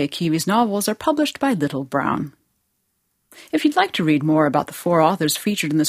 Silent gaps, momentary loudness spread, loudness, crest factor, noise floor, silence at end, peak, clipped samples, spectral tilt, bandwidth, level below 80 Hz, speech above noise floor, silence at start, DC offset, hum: none; 5 LU; -20 LUFS; 18 dB; -71 dBFS; 0 s; -2 dBFS; under 0.1%; -5 dB/octave; 16 kHz; -60 dBFS; 51 dB; 0 s; under 0.1%; none